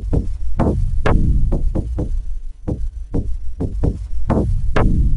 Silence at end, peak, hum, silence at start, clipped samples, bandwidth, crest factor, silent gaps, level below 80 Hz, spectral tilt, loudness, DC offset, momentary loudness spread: 0 s; -2 dBFS; none; 0 s; under 0.1%; 6 kHz; 14 dB; none; -18 dBFS; -9 dB/octave; -22 LUFS; under 0.1%; 10 LU